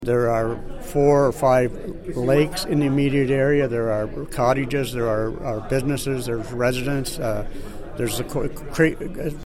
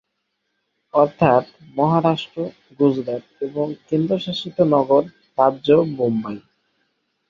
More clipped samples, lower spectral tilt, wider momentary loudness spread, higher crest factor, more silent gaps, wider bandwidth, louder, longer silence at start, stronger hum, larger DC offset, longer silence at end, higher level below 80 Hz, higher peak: neither; second, -6 dB/octave vs -8 dB/octave; second, 10 LU vs 13 LU; about the same, 16 dB vs 20 dB; neither; first, 16.5 kHz vs 7.4 kHz; about the same, -22 LUFS vs -20 LUFS; second, 0 s vs 0.95 s; second, none vs 50 Hz at -50 dBFS; neither; second, 0.05 s vs 0.9 s; first, -36 dBFS vs -58 dBFS; about the same, -4 dBFS vs -2 dBFS